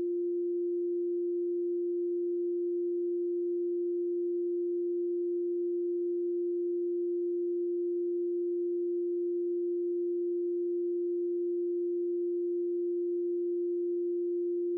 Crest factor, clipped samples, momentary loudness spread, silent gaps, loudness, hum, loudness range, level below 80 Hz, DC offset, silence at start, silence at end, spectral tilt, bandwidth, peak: 4 dB; under 0.1%; 0 LU; none; -32 LUFS; none; 0 LU; under -90 dBFS; under 0.1%; 0 s; 0 s; -6.5 dB/octave; 0.5 kHz; -28 dBFS